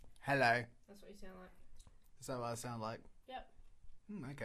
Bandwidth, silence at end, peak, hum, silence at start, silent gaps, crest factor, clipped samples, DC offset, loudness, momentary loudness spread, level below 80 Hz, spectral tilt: 15 kHz; 0 s; -20 dBFS; none; 0 s; none; 22 dB; under 0.1%; under 0.1%; -39 LUFS; 25 LU; -62 dBFS; -5 dB/octave